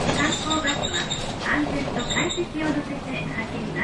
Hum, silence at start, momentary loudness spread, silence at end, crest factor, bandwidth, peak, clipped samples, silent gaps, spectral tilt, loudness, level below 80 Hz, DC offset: none; 0 s; 7 LU; 0 s; 16 dB; 11.5 kHz; -10 dBFS; under 0.1%; none; -3.5 dB/octave; -25 LUFS; -42 dBFS; under 0.1%